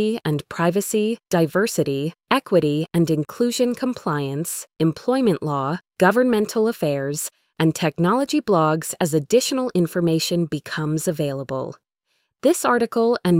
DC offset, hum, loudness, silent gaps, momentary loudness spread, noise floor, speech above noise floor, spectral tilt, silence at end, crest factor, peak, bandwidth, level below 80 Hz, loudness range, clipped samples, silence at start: under 0.1%; none; -21 LUFS; none; 7 LU; -72 dBFS; 51 dB; -5.5 dB/octave; 0 s; 18 dB; -2 dBFS; 16.5 kHz; -60 dBFS; 2 LU; under 0.1%; 0 s